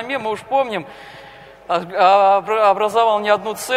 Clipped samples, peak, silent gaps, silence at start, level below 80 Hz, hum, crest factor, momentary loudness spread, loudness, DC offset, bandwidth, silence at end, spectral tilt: under 0.1%; 0 dBFS; none; 0 s; -60 dBFS; none; 16 dB; 11 LU; -16 LUFS; under 0.1%; 16 kHz; 0 s; -3.5 dB/octave